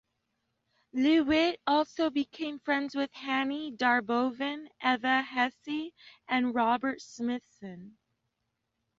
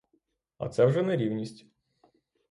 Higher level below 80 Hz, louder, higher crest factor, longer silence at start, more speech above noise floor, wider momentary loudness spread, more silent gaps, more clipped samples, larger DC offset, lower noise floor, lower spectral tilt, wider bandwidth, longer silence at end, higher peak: about the same, -66 dBFS vs -66 dBFS; about the same, -30 LUFS vs -28 LUFS; about the same, 18 dB vs 20 dB; first, 0.95 s vs 0.6 s; first, 53 dB vs 47 dB; second, 11 LU vs 15 LU; neither; neither; neither; first, -82 dBFS vs -74 dBFS; second, -4 dB/octave vs -8 dB/octave; second, 7.6 kHz vs 11 kHz; about the same, 1.1 s vs 1 s; about the same, -12 dBFS vs -12 dBFS